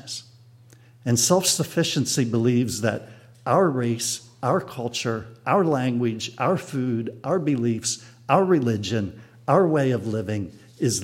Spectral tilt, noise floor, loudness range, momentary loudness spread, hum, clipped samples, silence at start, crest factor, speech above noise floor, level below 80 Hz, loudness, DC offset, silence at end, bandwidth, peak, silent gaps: -4.5 dB/octave; -51 dBFS; 3 LU; 11 LU; none; under 0.1%; 0.05 s; 20 dB; 28 dB; -62 dBFS; -23 LUFS; under 0.1%; 0 s; 16.5 kHz; -4 dBFS; none